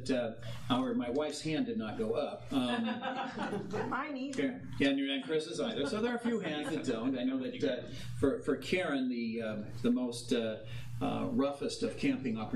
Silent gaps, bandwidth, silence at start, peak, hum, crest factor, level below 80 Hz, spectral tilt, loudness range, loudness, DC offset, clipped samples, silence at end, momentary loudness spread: none; 12.5 kHz; 0 s; -16 dBFS; none; 18 dB; -62 dBFS; -5.5 dB/octave; 1 LU; -35 LUFS; 0.2%; under 0.1%; 0 s; 5 LU